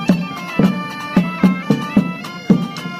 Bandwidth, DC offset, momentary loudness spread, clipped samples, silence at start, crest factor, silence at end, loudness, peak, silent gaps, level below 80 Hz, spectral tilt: 15 kHz; under 0.1%; 7 LU; under 0.1%; 0 s; 16 dB; 0 s; -17 LUFS; 0 dBFS; none; -48 dBFS; -7 dB/octave